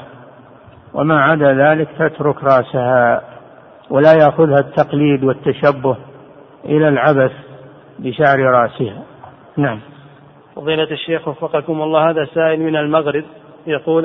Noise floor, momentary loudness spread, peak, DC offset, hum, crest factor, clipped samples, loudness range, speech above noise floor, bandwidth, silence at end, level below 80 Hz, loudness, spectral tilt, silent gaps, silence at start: -43 dBFS; 13 LU; 0 dBFS; under 0.1%; none; 16 dB; under 0.1%; 5 LU; 29 dB; 6 kHz; 0 s; -56 dBFS; -14 LUFS; -9 dB/octave; none; 0 s